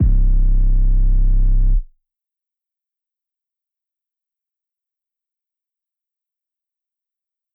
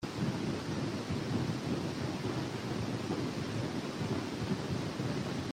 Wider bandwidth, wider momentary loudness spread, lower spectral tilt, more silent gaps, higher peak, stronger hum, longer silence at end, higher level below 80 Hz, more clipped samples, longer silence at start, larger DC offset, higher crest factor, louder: second, 0.7 kHz vs 16 kHz; about the same, 3 LU vs 2 LU; first, -14 dB/octave vs -6 dB/octave; neither; first, -6 dBFS vs -22 dBFS; neither; first, 5.7 s vs 0 s; first, -18 dBFS vs -60 dBFS; neither; about the same, 0 s vs 0 s; neither; about the same, 12 dB vs 14 dB; first, -20 LUFS vs -36 LUFS